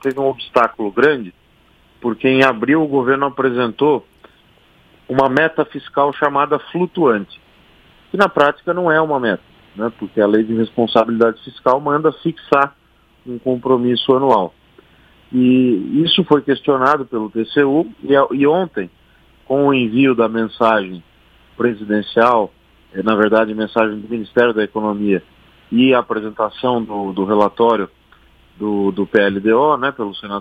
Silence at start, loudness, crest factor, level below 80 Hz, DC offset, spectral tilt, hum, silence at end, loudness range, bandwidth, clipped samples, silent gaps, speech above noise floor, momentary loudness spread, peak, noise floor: 0.05 s; -16 LUFS; 16 dB; -56 dBFS; under 0.1%; -7 dB/octave; none; 0 s; 2 LU; 8.4 kHz; under 0.1%; none; 37 dB; 10 LU; 0 dBFS; -52 dBFS